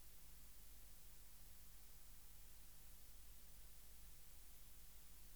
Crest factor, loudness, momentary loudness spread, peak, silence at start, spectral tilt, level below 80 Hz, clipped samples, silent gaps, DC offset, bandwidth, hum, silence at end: 12 dB; -63 LUFS; 0 LU; -48 dBFS; 0 s; -2 dB/octave; -66 dBFS; under 0.1%; none; 0.1%; over 20 kHz; none; 0 s